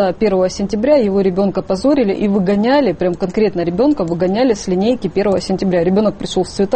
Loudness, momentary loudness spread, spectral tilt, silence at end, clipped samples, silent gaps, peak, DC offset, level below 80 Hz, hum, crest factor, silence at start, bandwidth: -15 LUFS; 4 LU; -6.5 dB/octave; 0 s; under 0.1%; none; -2 dBFS; under 0.1%; -40 dBFS; none; 12 dB; 0 s; 8.8 kHz